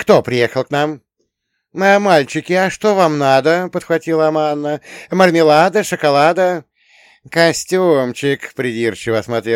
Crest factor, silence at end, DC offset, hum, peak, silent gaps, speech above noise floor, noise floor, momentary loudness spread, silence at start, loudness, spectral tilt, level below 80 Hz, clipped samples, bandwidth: 14 dB; 0 s; under 0.1%; none; 0 dBFS; none; 57 dB; -71 dBFS; 10 LU; 0 s; -14 LUFS; -5 dB/octave; -56 dBFS; under 0.1%; 16.5 kHz